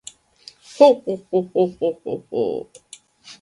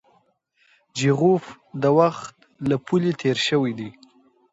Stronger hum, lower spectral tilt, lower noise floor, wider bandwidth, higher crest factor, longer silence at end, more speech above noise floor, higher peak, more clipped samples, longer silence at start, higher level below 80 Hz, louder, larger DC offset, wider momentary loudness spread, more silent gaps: neither; about the same, -6 dB/octave vs -6 dB/octave; second, -48 dBFS vs -65 dBFS; first, 11 kHz vs 8 kHz; about the same, 20 dB vs 20 dB; second, 0.1 s vs 0.6 s; second, 29 dB vs 44 dB; first, 0 dBFS vs -4 dBFS; neither; second, 0.75 s vs 0.95 s; about the same, -66 dBFS vs -64 dBFS; about the same, -20 LUFS vs -21 LUFS; neither; first, 23 LU vs 18 LU; neither